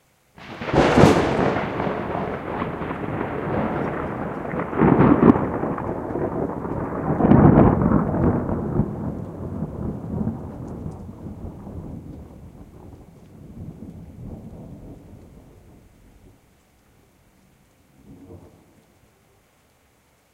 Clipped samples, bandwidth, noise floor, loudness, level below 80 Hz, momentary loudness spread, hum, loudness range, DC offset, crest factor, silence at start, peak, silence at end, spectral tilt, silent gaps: under 0.1%; 12.5 kHz; -60 dBFS; -21 LUFS; -38 dBFS; 25 LU; none; 22 LU; under 0.1%; 24 dB; 0.4 s; 0 dBFS; 1.85 s; -8 dB/octave; none